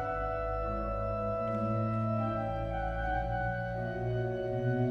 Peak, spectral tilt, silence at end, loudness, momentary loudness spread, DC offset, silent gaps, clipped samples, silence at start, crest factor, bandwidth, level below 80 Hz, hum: -20 dBFS; -9.5 dB/octave; 0 s; -34 LUFS; 3 LU; under 0.1%; none; under 0.1%; 0 s; 14 dB; 6.2 kHz; -42 dBFS; none